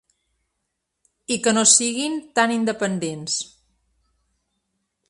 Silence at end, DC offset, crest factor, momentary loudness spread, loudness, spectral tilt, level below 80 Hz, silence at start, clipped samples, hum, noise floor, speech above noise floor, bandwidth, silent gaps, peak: 1.65 s; under 0.1%; 24 dB; 13 LU; -19 LUFS; -2 dB/octave; -66 dBFS; 1.3 s; under 0.1%; none; -78 dBFS; 57 dB; 11.5 kHz; none; 0 dBFS